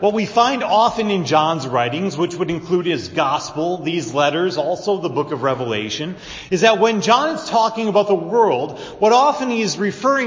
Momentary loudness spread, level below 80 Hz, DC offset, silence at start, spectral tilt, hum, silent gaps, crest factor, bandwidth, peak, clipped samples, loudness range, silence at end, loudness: 8 LU; -54 dBFS; under 0.1%; 0 s; -4.5 dB/octave; none; none; 18 dB; 7.6 kHz; 0 dBFS; under 0.1%; 4 LU; 0 s; -18 LUFS